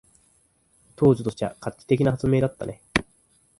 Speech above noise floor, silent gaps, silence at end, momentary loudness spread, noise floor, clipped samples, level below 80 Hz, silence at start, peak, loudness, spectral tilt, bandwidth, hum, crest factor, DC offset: 41 dB; none; 0.6 s; 10 LU; -64 dBFS; under 0.1%; -50 dBFS; 1 s; -2 dBFS; -24 LUFS; -7 dB/octave; 11.5 kHz; none; 22 dB; under 0.1%